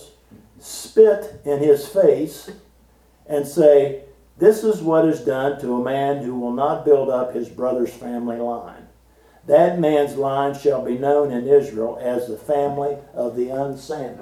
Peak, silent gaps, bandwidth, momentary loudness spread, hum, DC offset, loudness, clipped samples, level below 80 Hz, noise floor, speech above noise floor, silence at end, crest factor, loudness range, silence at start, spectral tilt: -2 dBFS; none; 14.5 kHz; 12 LU; none; under 0.1%; -19 LUFS; under 0.1%; -56 dBFS; -54 dBFS; 35 dB; 0 s; 18 dB; 3 LU; 0 s; -6.5 dB/octave